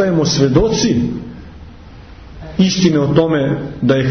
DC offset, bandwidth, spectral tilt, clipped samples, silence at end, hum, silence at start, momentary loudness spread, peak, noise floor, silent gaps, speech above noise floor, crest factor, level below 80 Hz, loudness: under 0.1%; 6.6 kHz; -5.5 dB/octave; under 0.1%; 0 s; none; 0 s; 15 LU; 0 dBFS; -36 dBFS; none; 23 dB; 14 dB; -34 dBFS; -14 LUFS